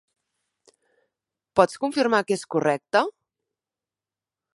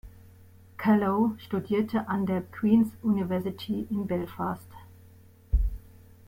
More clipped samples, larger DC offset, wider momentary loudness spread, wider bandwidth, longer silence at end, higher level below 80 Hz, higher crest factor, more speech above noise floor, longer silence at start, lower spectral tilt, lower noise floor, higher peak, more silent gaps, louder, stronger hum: neither; neither; second, 4 LU vs 10 LU; second, 11.5 kHz vs 16 kHz; first, 1.45 s vs 0.4 s; second, -68 dBFS vs -38 dBFS; first, 24 dB vs 18 dB; first, over 68 dB vs 27 dB; first, 1.55 s vs 0.05 s; second, -4.5 dB/octave vs -8.5 dB/octave; first, under -90 dBFS vs -54 dBFS; first, -2 dBFS vs -10 dBFS; neither; first, -23 LUFS vs -28 LUFS; neither